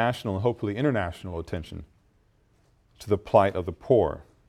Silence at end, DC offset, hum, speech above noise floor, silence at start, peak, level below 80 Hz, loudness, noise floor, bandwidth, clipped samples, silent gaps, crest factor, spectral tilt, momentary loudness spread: 0.25 s; under 0.1%; none; 38 dB; 0 s; -6 dBFS; -50 dBFS; -26 LUFS; -64 dBFS; 14.5 kHz; under 0.1%; none; 22 dB; -7.5 dB/octave; 14 LU